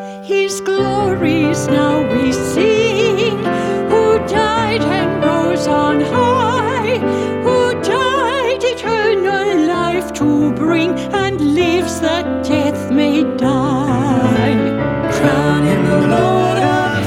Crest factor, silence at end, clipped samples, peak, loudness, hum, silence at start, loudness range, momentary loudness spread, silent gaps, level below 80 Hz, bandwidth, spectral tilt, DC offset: 14 dB; 0 s; under 0.1%; 0 dBFS; -15 LUFS; none; 0 s; 1 LU; 4 LU; none; -40 dBFS; 15.5 kHz; -5.5 dB/octave; under 0.1%